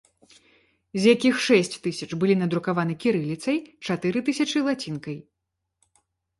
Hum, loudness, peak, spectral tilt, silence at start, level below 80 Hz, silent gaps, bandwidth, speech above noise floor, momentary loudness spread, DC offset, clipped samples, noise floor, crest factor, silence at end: none; -24 LUFS; -6 dBFS; -5.5 dB/octave; 0.95 s; -66 dBFS; none; 11.5 kHz; 58 dB; 12 LU; under 0.1%; under 0.1%; -81 dBFS; 20 dB; 1.2 s